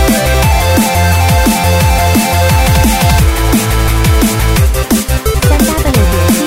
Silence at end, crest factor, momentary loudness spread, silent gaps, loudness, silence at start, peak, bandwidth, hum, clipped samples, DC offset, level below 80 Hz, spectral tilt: 0 s; 8 dB; 2 LU; none; -10 LUFS; 0 s; 0 dBFS; 16.5 kHz; none; under 0.1%; 0.8%; -14 dBFS; -5 dB/octave